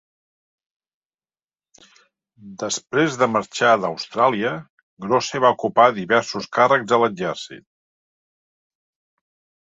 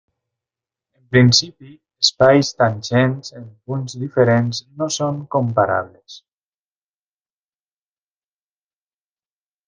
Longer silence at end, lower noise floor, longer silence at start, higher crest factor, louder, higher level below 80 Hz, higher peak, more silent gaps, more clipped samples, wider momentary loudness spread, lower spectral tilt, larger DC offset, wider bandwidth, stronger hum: second, 2.15 s vs 3.5 s; about the same, under -90 dBFS vs under -90 dBFS; first, 2.45 s vs 1.1 s; about the same, 20 dB vs 20 dB; about the same, -19 LUFS vs -17 LUFS; second, -66 dBFS vs -54 dBFS; about the same, -2 dBFS vs 0 dBFS; first, 4.70-4.97 s vs none; neither; second, 11 LU vs 15 LU; about the same, -4 dB/octave vs -5 dB/octave; neither; second, 8.4 kHz vs 9.6 kHz; neither